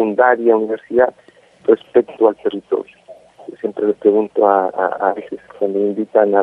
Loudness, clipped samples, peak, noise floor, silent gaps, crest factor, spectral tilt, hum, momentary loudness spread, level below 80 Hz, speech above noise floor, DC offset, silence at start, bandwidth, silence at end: -17 LUFS; under 0.1%; 0 dBFS; -41 dBFS; none; 16 dB; -8 dB/octave; none; 12 LU; -64 dBFS; 26 dB; under 0.1%; 0 s; 3.9 kHz; 0 s